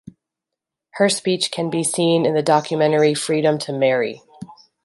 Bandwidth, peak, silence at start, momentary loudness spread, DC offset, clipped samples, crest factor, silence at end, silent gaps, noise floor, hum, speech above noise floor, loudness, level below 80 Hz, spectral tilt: 12 kHz; -2 dBFS; 0.95 s; 5 LU; under 0.1%; under 0.1%; 16 dB; 0.3 s; none; -84 dBFS; none; 66 dB; -19 LUFS; -68 dBFS; -4.5 dB/octave